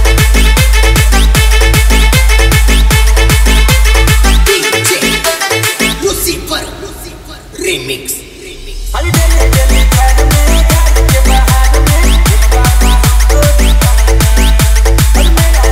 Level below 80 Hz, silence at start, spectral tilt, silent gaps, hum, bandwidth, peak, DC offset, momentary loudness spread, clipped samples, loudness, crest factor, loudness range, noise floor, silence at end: -8 dBFS; 0 s; -4 dB/octave; none; none; 16.5 kHz; 0 dBFS; under 0.1%; 9 LU; 0.4%; -9 LUFS; 6 dB; 6 LU; -28 dBFS; 0 s